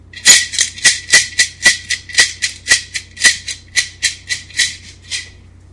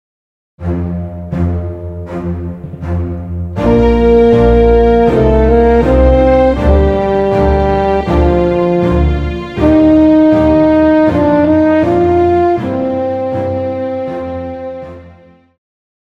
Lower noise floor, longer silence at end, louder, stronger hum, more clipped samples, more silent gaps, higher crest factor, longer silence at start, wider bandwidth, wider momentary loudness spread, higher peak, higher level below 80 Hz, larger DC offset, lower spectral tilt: about the same, -39 dBFS vs -41 dBFS; second, 0.4 s vs 1.05 s; about the same, -12 LUFS vs -11 LUFS; neither; first, 0.5% vs under 0.1%; neither; first, 16 dB vs 10 dB; second, 0.15 s vs 0.6 s; first, 12 kHz vs 7.4 kHz; about the same, 16 LU vs 14 LU; about the same, 0 dBFS vs 0 dBFS; second, -46 dBFS vs -20 dBFS; neither; second, 2 dB/octave vs -9.5 dB/octave